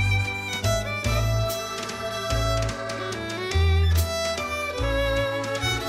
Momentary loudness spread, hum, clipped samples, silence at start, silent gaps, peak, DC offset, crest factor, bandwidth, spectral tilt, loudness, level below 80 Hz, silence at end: 8 LU; none; under 0.1%; 0 s; none; -10 dBFS; under 0.1%; 14 dB; 16 kHz; -4.5 dB/octave; -25 LUFS; -32 dBFS; 0 s